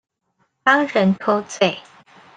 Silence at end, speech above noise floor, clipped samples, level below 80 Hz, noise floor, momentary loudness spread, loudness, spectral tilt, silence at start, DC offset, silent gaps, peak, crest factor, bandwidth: 0.55 s; 50 dB; under 0.1%; -66 dBFS; -68 dBFS; 6 LU; -18 LUFS; -5 dB/octave; 0.65 s; under 0.1%; none; -2 dBFS; 18 dB; 9.4 kHz